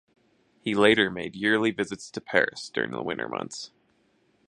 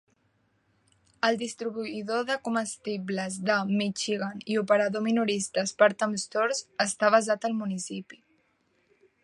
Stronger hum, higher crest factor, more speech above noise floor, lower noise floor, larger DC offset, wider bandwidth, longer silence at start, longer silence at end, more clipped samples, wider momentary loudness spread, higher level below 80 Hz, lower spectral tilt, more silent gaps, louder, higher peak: neither; about the same, 24 dB vs 22 dB; about the same, 41 dB vs 43 dB; about the same, -67 dBFS vs -70 dBFS; neither; about the same, 11 kHz vs 11.5 kHz; second, 0.65 s vs 1.25 s; second, 0.85 s vs 1.1 s; neither; first, 16 LU vs 10 LU; first, -64 dBFS vs -76 dBFS; about the same, -4.5 dB/octave vs -4 dB/octave; neither; about the same, -26 LUFS vs -27 LUFS; about the same, -4 dBFS vs -6 dBFS